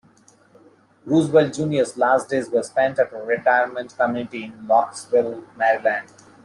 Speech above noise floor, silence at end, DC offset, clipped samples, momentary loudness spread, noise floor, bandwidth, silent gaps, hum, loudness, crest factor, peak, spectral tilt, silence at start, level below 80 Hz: 34 dB; 0.45 s; under 0.1%; under 0.1%; 8 LU; -54 dBFS; 11.5 kHz; none; none; -21 LUFS; 18 dB; -4 dBFS; -5.5 dB/octave; 1.05 s; -64 dBFS